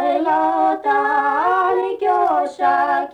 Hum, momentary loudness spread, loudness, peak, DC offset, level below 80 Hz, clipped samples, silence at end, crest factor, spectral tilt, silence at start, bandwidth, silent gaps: none; 2 LU; -17 LUFS; -6 dBFS; under 0.1%; -62 dBFS; under 0.1%; 0 s; 10 dB; -5 dB/octave; 0 s; 9.4 kHz; none